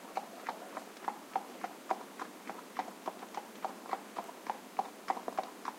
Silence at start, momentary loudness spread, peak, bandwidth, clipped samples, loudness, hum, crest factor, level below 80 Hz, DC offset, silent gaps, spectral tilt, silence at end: 0 s; 6 LU; -16 dBFS; 16 kHz; under 0.1%; -42 LUFS; none; 26 dB; under -90 dBFS; under 0.1%; none; -3 dB/octave; 0 s